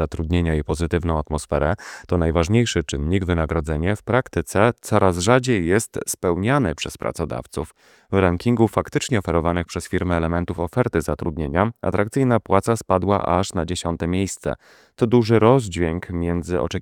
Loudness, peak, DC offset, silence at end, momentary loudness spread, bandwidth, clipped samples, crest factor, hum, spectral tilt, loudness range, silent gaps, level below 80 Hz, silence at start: -21 LUFS; 0 dBFS; under 0.1%; 0 s; 8 LU; 16.5 kHz; under 0.1%; 20 dB; none; -6 dB/octave; 2 LU; none; -36 dBFS; 0 s